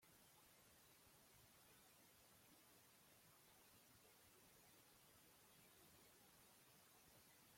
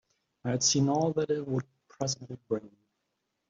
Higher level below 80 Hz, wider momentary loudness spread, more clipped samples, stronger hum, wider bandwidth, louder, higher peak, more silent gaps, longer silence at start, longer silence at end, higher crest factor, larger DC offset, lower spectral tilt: second, under -90 dBFS vs -68 dBFS; second, 1 LU vs 12 LU; neither; neither; first, 16.5 kHz vs 7.8 kHz; second, -70 LUFS vs -30 LUFS; second, -58 dBFS vs -14 dBFS; neither; second, 0 s vs 0.45 s; second, 0 s vs 0.8 s; about the same, 14 dB vs 18 dB; neither; second, -2.5 dB/octave vs -4.5 dB/octave